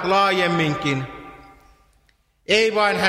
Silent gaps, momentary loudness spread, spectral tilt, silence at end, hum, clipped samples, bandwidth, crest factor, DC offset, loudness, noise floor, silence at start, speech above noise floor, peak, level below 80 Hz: none; 19 LU; -4.5 dB/octave; 0 s; none; under 0.1%; 14.5 kHz; 20 dB; under 0.1%; -19 LUFS; -62 dBFS; 0 s; 43 dB; 0 dBFS; -54 dBFS